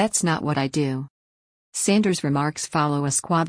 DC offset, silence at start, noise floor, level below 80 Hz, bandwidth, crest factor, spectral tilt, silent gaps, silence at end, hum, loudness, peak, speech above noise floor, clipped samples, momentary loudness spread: under 0.1%; 0 s; under -90 dBFS; -60 dBFS; 10.5 kHz; 16 dB; -4.5 dB/octave; 1.10-1.72 s; 0 s; none; -23 LUFS; -8 dBFS; over 68 dB; under 0.1%; 9 LU